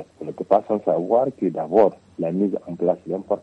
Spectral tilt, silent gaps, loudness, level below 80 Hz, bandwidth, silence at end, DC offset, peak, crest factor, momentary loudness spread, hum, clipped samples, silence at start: -9.5 dB/octave; none; -22 LUFS; -66 dBFS; 8.6 kHz; 0 s; under 0.1%; -2 dBFS; 18 dB; 8 LU; none; under 0.1%; 0 s